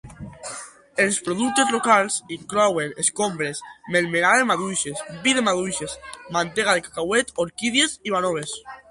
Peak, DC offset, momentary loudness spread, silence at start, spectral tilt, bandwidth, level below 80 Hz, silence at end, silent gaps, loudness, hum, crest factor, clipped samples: -4 dBFS; under 0.1%; 15 LU; 0.05 s; -2.5 dB/octave; 11.5 kHz; -58 dBFS; 0.1 s; none; -21 LUFS; none; 20 dB; under 0.1%